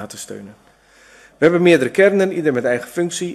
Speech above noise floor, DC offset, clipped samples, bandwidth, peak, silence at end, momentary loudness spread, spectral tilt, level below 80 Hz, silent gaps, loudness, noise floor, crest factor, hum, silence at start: 33 dB; under 0.1%; under 0.1%; 13 kHz; 0 dBFS; 0 s; 18 LU; -5.5 dB/octave; -60 dBFS; none; -16 LUFS; -49 dBFS; 18 dB; none; 0 s